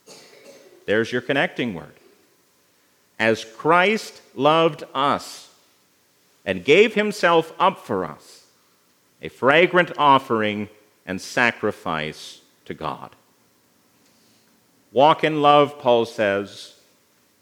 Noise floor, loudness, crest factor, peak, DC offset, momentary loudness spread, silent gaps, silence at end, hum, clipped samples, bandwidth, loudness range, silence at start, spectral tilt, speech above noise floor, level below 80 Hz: -61 dBFS; -20 LUFS; 22 dB; 0 dBFS; under 0.1%; 21 LU; none; 0.75 s; none; under 0.1%; 18.5 kHz; 7 LU; 0.1 s; -5 dB/octave; 41 dB; -68 dBFS